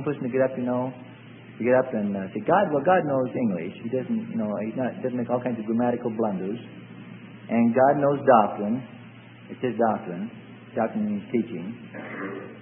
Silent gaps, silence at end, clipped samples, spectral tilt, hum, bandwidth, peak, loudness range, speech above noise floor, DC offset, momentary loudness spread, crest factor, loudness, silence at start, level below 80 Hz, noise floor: none; 0 s; under 0.1%; -11.5 dB/octave; none; 3.5 kHz; -4 dBFS; 6 LU; 21 dB; under 0.1%; 23 LU; 22 dB; -25 LUFS; 0 s; -70 dBFS; -45 dBFS